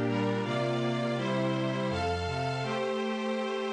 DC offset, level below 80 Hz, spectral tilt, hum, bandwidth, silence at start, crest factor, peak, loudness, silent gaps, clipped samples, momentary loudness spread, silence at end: under 0.1%; -64 dBFS; -6.5 dB/octave; none; 10.5 kHz; 0 s; 14 dB; -16 dBFS; -31 LUFS; none; under 0.1%; 2 LU; 0 s